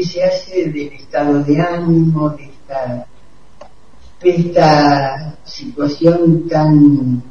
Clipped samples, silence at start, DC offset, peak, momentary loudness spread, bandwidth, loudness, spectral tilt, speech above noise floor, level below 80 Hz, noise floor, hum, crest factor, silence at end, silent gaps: under 0.1%; 0 s; 2%; 0 dBFS; 17 LU; 7 kHz; -14 LUFS; -8 dB/octave; 33 dB; -46 dBFS; -47 dBFS; none; 14 dB; 0 s; none